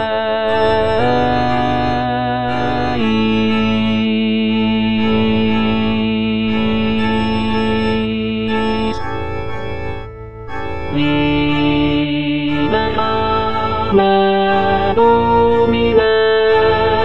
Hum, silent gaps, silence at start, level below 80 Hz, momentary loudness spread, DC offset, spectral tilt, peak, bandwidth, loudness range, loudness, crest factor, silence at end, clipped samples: none; none; 0 s; -34 dBFS; 10 LU; 5%; -7.5 dB/octave; 0 dBFS; 8.4 kHz; 6 LU; -15 LUFS; 14 dB; 0 s; under 0.1%